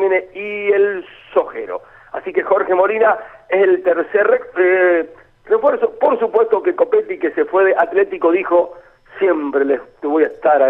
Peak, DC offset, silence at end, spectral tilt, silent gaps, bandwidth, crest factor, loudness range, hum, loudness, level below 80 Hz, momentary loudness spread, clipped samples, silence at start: -2 dBFS; under 0.1%; 0 s; -7.5 dB/octave; none; 3.9 kHz; 14 dB; 2 LU; none; -16 LUFS; -58 dBFS; 9 LU; under 0.1%; 0 s